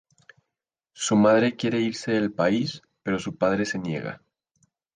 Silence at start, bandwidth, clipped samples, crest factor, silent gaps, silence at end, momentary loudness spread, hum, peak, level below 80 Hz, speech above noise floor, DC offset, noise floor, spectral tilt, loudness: 0.95 s; 10 kHz; under 0.1%; 18 dB; none; 0.8 s; 13 LU; none; -6 dBFS; -62 dBFS; 63 dB; under 0.1%; -86 dBFS; -5 dB/octave; -24 LUFS